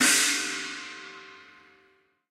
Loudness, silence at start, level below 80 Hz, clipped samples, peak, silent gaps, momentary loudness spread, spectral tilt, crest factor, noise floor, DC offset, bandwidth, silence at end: -25 LUFS; 0 s; -78 dBFS; under 0.1%; -8 dBFS; none; 24 LU; 1 dB/octave; 22 dB; -65 dBFS; under 0.1%; 16 kHz; 0.85 s